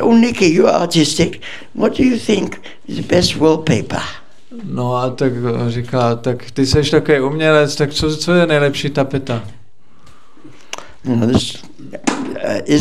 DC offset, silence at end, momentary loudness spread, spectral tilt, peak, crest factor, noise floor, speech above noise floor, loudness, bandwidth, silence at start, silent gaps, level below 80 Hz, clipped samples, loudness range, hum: 3%; 0 s; 14 LU; -5.5 dB/octave; 0 dBFS; 16 dB; -50 dBFS; 35 dB; -15 LUFS; 13.5 kHz; 0 s; none; -40 dBFS; under 0.1%; 6 LU; none